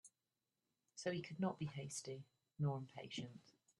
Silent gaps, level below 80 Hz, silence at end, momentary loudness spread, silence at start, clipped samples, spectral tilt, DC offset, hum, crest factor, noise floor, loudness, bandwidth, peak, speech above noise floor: none; -82 dBFS; 0.3 s; 14 LU; 0.05 s; under 0.1%; -5.5 dB/octave; under 0.1%; none; 18 dB; under -90 dBFS; -47 LUFS; 12 kHz; -30 dBFS; over 44 dB